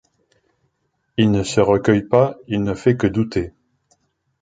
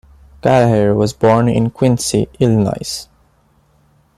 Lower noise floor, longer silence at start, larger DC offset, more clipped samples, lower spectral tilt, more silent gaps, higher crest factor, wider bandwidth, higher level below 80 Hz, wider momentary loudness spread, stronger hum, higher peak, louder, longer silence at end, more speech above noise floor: first, -70 dBFS vs -55 dBFS; first, 1.2 s vs 0.45 s; neither; neither; about the same, -6.5 dB/octave vs -6 dB/octave; neither; about the same, 18 dB vs 14 dB; second, 9.4 kHz vs 13.5 kHz; about the same, -44 dBFS vs -42 dBFS; about the same, 9 LU vs 9 LU; neither; about the same, -2 dBFS vs 0 dBFS; second, -18 LUFS vs -14 LUFS; second, 0.9 s vs 1.15 s; first, 53 dB vs 41 dB